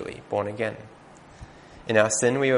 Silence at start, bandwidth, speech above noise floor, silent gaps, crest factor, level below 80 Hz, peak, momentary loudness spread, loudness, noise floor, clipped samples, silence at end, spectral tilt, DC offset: 0 s; 10.5 kHz; 23 dB; none; 22 dB; -56 dBFS; -4 dBFS; 23 LU; -24 LUFS; -46 dBFS; under 0.1%; 0 s; -4 dB/octave; under 0.1%